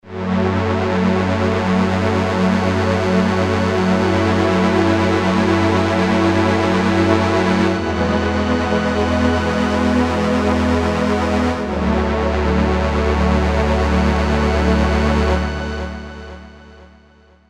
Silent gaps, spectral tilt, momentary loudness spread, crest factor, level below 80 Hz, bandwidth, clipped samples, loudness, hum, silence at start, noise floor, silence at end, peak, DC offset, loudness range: none; -6.5 dB/octave; 3 LU; 16 dB; -26 dBFS; 11 kHz; under 0.1%; -17 LUFS; none; 0.05 s; -49 dBFS; 0.65 s; 0 dBFS; under 0.1%; 2 LU